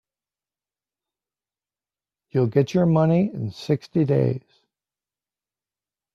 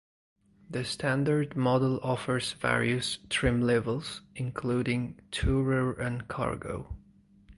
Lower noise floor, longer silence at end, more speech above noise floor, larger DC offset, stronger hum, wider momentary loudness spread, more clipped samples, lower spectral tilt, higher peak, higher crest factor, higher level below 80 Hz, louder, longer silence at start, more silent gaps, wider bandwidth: first, under -90 dBFS vs -57 dBFS; first, 1.75 s vs 0.05 s; first, over 70 dB vs 28 dB; neither; neither; about the same, 9 LU vs 10 LU; neither; first, -9 dB/octave vs -5.5 dB/octave; first, -6 dBFS vs -10 dBFS; about the same, 20 dB vs 20 dB; second, -60 dBFS vs -46 dBFS; first, -22 LUFS vs -30 LUFS; first, 2.35 s vs 0.7 s; neither; second, 7.2 kHz vs 11.5 kHz